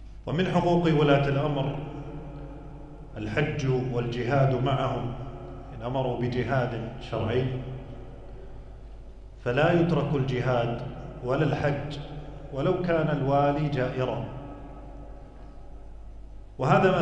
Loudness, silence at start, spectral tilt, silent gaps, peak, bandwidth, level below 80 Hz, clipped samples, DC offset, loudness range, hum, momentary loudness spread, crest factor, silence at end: -27 LUFS; 0 s; -8 dB/octave; none; -8 dBFS; 8.2 kHz; -44 dBFS; under 0.1%; under 0.1%; 4 LU; none; 23 LU; 20 dB; 0 s